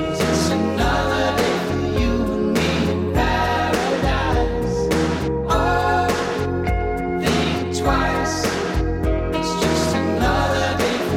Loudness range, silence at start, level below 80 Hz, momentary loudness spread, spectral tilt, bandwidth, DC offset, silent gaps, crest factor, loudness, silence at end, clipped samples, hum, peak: 1 LU; 0 s; -28 dBFS; 3 LU; -5 dB/octave; 17 kHz; under 0.1%; none; 12 dB; -20 LUFS; 0 s; under 0.1%; none; -8 dBFS